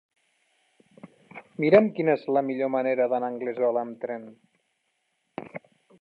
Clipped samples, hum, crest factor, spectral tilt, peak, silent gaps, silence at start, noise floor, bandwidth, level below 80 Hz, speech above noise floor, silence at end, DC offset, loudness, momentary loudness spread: under 0.1%; none; 22 dB; -9 dB/octave; -4 dBFS; none; 1.05 s; -75 dBFS; 5.2 kHz; -76 dBFS; 51 dB; 0.4 s; under 0.1%; -25 LUFS; 23 LU